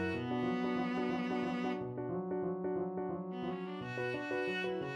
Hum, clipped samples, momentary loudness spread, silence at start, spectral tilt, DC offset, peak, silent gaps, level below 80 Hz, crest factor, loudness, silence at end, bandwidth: none; under 0.1%; 5 LU; 0 s; -7 dB/octave; under 0.1%; -24 dBFS; none; -70 dBFS; 12 dB; -38 LUFS; 0 s; 9.8 kHz